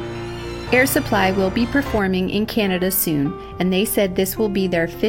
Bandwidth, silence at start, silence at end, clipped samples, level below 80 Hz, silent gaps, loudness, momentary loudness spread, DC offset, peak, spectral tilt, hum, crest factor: 16.5 kHz; 0 s; 0 s; under 0.1%; -38 dBFS; none; -19 LUFS; 7 LU; under 0.1%; -2 dBFS; -5 dB/octave; none; 16 dB